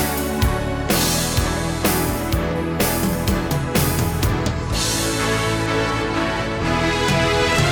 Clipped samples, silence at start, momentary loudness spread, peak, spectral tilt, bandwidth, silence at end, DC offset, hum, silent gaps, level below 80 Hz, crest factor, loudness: under 0.1%; 0 s; 5 LU; -6 dBFS; -4.5 dB/octave; over 20 kHz; 0 s; under 0.1%; none; none; -30 dBFS; 14 dB; -20 LUFS